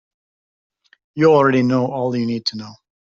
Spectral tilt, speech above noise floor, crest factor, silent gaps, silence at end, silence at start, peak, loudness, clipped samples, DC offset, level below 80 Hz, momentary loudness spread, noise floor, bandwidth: -6.5 dB/octave; over 73 dB; 18 dB; none; 0.4 s; 1.15 s; -2 dBFS; -17 LUFS; under 0.1%; under 0.1%; -60 dBFS; 21 LU; under -90 dBFS; 7.4 kHz